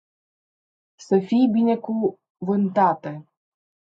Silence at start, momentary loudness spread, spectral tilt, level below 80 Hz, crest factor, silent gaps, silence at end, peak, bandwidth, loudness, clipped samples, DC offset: 1 s; 13 LU; -8 dB/octave; -72 dBFS; 18 dB; 2.30-2.35 s; 0.75 s; -6 dBFS; 7.6 kHz; -21 LUFS; under 0.1%; under 0.1%